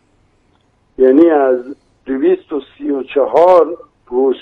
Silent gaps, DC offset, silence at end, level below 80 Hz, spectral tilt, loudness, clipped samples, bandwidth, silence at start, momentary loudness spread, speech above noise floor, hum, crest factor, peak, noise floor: none; under 0.1%; 0.05 s; -54 dBFS; -7 dB/octave; -13 LUFS; under 0.1%; 5.4 kHz; 1 s; 15 LU; 44 dB; none; 14 dB; 0 dBFS; -56 dBFS